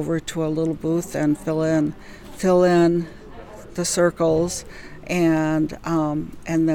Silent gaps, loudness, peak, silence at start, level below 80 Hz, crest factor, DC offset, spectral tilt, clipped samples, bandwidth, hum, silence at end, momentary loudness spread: none; -21 LUFS; -6 dBFS; 0 s; -46 dBFS; 16 dB; under 0.1%; -6 dB/octave; under 0.1%; 17.5 kHz; none; 0 s; 20 LU